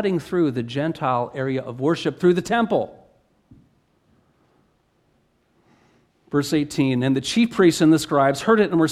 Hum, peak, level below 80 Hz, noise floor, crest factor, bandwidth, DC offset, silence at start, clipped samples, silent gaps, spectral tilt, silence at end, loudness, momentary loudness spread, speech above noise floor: none; -4 dBFS; -58 dBFS; -64 dBFS; 18 dB; 14 kHz; under 0.1%; 0 s; under 0.1%; none; -6 dB/octave; 0 s; -20 LUFS; 8 LU; 44 dB